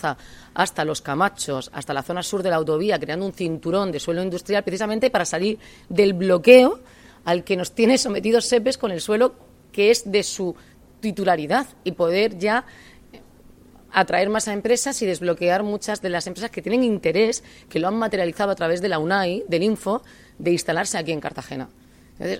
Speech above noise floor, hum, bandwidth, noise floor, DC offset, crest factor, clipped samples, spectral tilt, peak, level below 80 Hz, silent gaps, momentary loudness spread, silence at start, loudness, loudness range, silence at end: 28 dB; none; 16.5 kHz; -49 dBFS; under 0.1%; 22 dB; under 0.1%; -4 dB/octave; 0 dBFS; -54 dBFS; none; 11 LU; 0 s; -21 LUFS; 6 LU; 0 s